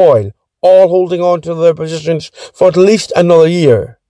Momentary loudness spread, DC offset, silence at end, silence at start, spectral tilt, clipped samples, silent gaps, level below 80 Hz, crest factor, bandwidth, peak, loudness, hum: 10 LU; under 0.1%; 0.2 s; 0 s; -6.5 dB/octave; 2%; none; -50 dBFS; 10 dB; 10.5 kHz; 0 dBFS; -10 LUFS; none